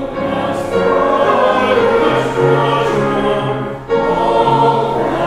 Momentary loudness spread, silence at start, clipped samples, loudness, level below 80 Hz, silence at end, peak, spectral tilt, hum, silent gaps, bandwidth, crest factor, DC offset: 6 LU; 0 s; under 0.1%; -14 LUFS; -38 dBFS; 0 s; 0 dBFS; -6.5 dB/octave; none; none; 12.5 kHz; 14 dB; under 0.1%